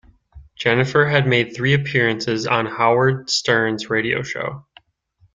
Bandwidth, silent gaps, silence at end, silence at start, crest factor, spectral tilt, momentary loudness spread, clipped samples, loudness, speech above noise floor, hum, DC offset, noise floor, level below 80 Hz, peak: 9.2 kHz; none; 0.75 s; 0.35 s; 18 dB; -5 dB/octave; 7 LU; under 0.1%; -18 LUFS; 41 dB; none; under 0.1%; -59 dBFS; -52 dBFS; -2 dBFS